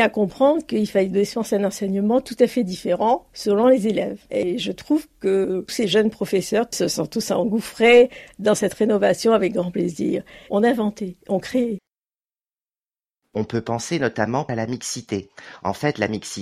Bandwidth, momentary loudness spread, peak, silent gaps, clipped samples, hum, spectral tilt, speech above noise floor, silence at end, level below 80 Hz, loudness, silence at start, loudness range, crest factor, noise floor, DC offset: 15 kHz; 9 LU; -4 dBFS; none; under 0.1%; none; -5 dB/octave; over 69 dB; 0 s; -56 dBFS; -21 LUFS; 0 s; 8 LU; 18 dB; under -90 dBFS; under 0.1%